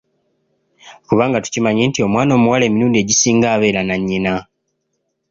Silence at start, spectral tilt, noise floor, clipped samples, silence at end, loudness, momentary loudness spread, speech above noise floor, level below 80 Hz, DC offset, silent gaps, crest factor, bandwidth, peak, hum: 0.85 s; -4.5 dB/octave; -71 dBFS; under 0.1%; 0.9 s; -15 LUFS; 6 LU; 56 dB; -48 dBFS; under 0.1%; none; 14 dB; 7.6 kHz; -2 dBFS; none